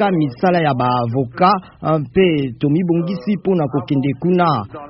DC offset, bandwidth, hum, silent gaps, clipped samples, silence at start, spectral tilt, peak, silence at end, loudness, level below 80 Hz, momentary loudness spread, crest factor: under 0.1%; 5.8 kHz; none; none; under 0.1%; 0 s; -6.5 dB/octave; 0 dBFS; 0 s; -17 LUFS; -50 dBFS; 5 LU; 16 dB